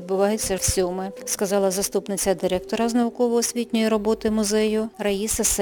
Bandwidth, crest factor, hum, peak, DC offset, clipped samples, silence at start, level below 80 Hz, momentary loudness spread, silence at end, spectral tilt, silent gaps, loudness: 19 kHz; 16 dB; none; -8 dBFS; under 0.1%; under 0.1%; 0 s; -42 dBFS; 4 LU; 0 s; -3.5 dB/octave; none; -22 LUFS